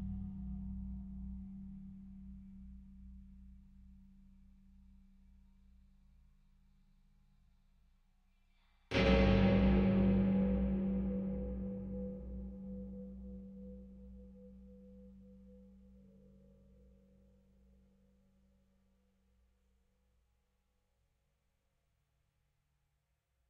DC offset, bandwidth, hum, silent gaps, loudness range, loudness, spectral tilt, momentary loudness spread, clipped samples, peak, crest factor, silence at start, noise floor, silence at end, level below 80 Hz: under 0.1%; 6.4 kHz; none; none; 25 LU; -35 LUFS; -7 dB/octave; 28 LU; under 0.1%; -18 dBFS; 22 dB; 0 s; -82 dBFS; 7.85 s; -48 dBFS